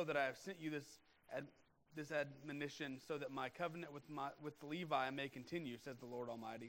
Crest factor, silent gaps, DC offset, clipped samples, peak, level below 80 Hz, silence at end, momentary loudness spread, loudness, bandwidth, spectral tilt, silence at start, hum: 22 dB; none; under 0.1%; under 0.1%; -26 dBFS; -84 dBFS; 0 s; 11 LU; -47 LUFS; 16 kHz; -5 dB/octave; 0 s; none